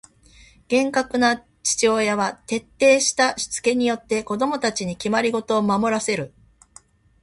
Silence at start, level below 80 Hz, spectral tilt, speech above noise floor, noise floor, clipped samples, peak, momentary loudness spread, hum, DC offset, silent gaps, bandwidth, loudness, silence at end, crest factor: 0.7 s; -56 dBFS; -3 dB/octave; 31 dB; -52 dBFS; under 0.1%; -4 dBFS; 8 LU; none; under 0.1%; none; 11.5 kHz; -21 LUFS; 0.95 s; 18 dB